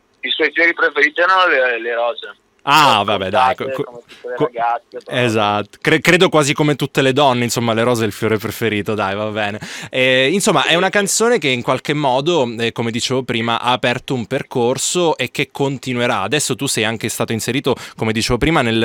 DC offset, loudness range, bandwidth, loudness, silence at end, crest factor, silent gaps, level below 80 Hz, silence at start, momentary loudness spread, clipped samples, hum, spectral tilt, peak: under 0.1%; 3 LU; 19 kHz; -16 LUFS; 0 s; 16 dB; none; -44 dBFS; 0.25 s; 9 LU; under 0.1%; none; -4 dB/octave; 0 dBFS